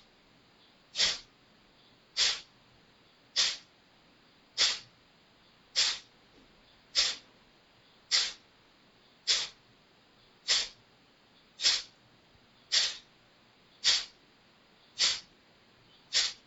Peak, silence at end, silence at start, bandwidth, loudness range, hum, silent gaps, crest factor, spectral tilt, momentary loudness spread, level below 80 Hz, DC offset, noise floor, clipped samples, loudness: -12 dBFS; 0.15 s; 0.95 s; 19 kHz; 3 LU; none; none; 24 dB; 2.5 dB/octave; 14 LU; -70 dBFS; under 0.1%; -63 dBFS; under 0.1%; -29 LUFS